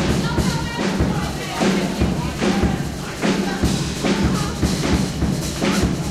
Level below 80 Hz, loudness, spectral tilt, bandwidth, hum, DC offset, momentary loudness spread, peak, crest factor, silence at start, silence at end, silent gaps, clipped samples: -30 dBFS; -21 LUFS; -5 dB/octave; 15.5 kHz; none; under 0.1%; 3 LU; -6 dBFS; 14 dB; 0 s; 0 s; none; under 0.1%